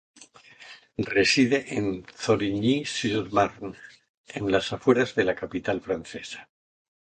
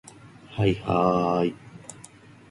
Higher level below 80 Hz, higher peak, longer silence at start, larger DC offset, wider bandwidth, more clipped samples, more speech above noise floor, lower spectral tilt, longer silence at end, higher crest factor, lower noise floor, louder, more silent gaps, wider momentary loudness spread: second, -56 dBFS vs -50 dBFS; about the same, -6 dBFS vs -8 dBFS; about the same, 0.2 s vs 0.25 s; neither; second, 9.4 kHz vs 11.5 kHz; neither; about the same, 26 dB vs 26 dB; second, -4.5 dB/octave vs -7 dB/octave; first, 0.7 s vs 0.5 s; about the same, 20 dB vs 20 dB; about the same, -51 dBFS vs -49 dBFS; about the same, -25 LUFS vs -24 LUFS; first, 4.09-4.24 s vs none; second, 18 LU vs 21 LU